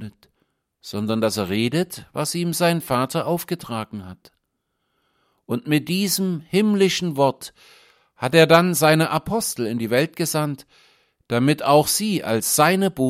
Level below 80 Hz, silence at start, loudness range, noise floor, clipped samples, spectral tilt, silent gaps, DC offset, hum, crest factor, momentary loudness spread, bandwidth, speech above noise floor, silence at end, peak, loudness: -58 dBFS; 0 s; 7 LU; -75 dBFS; under 0.1%; -4.5 dB/octave; none; under 0.1%; none; 20 dB; 13 LU; 16.5 kHz; 55 dB; 0 s; 0 dBFS; -20 LUFS